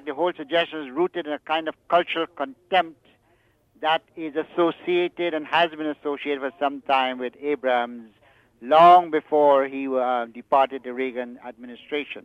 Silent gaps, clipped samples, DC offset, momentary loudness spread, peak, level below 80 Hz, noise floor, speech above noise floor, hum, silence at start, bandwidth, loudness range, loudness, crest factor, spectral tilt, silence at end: none; under 0.1%; under 0.1%; 13 LU; -4 dBFS; -72 dBFS; -63 dBFS; 40 dB; none; 0.05 s; 6.2 kHz; 6 LU; -23 LUFS; 20 dB; -6 dB/octave; 0.05 s